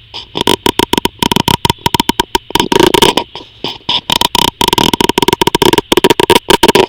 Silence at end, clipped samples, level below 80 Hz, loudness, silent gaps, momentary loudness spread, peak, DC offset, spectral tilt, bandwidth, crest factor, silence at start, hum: 0 s; 2%; -32 dBFS; -10 LUFS; none; 7 LU; 0 dBFS; under 0.1%; -3.5 dB/octave; over 20 kHz; 12 dB; 0.15 s; none